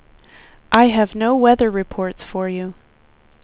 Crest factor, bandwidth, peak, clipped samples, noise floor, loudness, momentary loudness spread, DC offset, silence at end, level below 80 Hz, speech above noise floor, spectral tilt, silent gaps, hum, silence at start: 18 dB; 4 kHz; 0 dBFS; under 0.1%; -53 dBFS; -17 LUFS; 12 LU; under 0.1%; 0.7 s; -46 dBFS; 36 dB; -10 dB/octave; none; none; 0.7 s